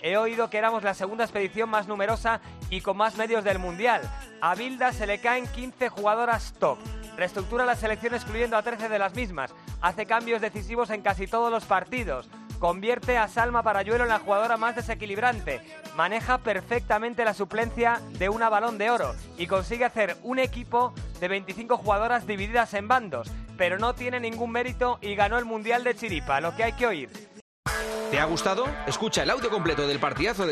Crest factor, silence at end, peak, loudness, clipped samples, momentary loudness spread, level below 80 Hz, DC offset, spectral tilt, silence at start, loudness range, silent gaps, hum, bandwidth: 18 dB; 0 s; -8 dBFS; -27 LUFS; under 0.1%; 7 LU; -44 dBFS; under 0.1%; -4.5 dB/octave; 0 s; 2 LU; 27.41-27.63 s; none; 13.5 kHz